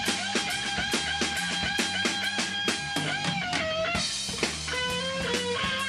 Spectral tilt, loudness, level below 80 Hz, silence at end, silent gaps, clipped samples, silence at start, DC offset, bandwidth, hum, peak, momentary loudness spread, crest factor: -2 dB/octave; -27 LUFS; -50 dBFS; 0 s; none; under 0.1%; 0 s; under 0.1%; 14.5 kHz; none; -12 dBFS; 2 LU; 18 dB